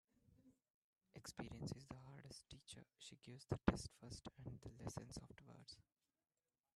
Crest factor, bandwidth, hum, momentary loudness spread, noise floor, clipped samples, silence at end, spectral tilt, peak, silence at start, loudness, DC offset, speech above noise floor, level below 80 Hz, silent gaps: 34 dB; 13 kHz; none; 18 LU; -74 dBFS; under 0.1%; 0.95 s; -5.5 dB/octave; -20 dBFS; 0.3 s; -52 LUFS; under 0.1%; 23 dB; -66 dBFS; 0.70-0.93 s